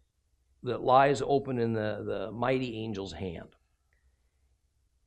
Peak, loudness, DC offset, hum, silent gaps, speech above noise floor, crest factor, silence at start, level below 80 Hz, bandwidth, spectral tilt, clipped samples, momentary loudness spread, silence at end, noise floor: -8 dBFS; -29 LUFS; under 0.1%; none; none; 43 dB; 22 dB; 0.65 s; -60 dBFS; 10 kHz; -6.5 dB/octave; under 0.1%; 16 LU; 1.6 s; -72 dBFS